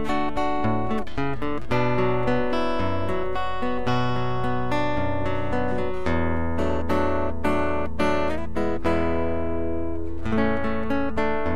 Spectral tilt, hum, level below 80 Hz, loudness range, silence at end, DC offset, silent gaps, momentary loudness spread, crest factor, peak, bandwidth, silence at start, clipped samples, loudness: -7.5 dB/octave; none; -38 dBFS; 1 LU; 0 s; 6%; none; 4 LU; 16 dB; -8 dBFS; 13.5 kHz; 0 s; under 0.1%; -26 LUFS